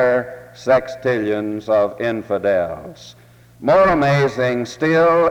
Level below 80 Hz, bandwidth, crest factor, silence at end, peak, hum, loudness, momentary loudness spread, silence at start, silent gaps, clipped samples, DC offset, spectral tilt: -48 dBFS; 14 kHz; 14 dB; 0 s; -4 dBFS; none; -18 LUFS; 12 LU; 0 s; none; under 0.1%; under 0.1%; -6.5 dB/octave